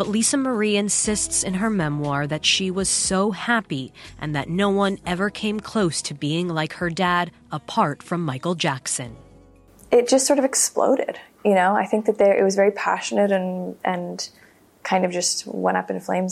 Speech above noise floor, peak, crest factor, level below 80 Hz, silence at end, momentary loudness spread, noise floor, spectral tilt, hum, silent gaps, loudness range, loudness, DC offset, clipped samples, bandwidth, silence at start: 28 dB; -6 dBFS; 16 dB; -52 dBFS; 0 s; 10 LU; -50 dBFS; -3.5 dB/octave; none; none; 5 LU; -21 LUFS; under 0.1%; under 0.1%; 15 kHz; 0 s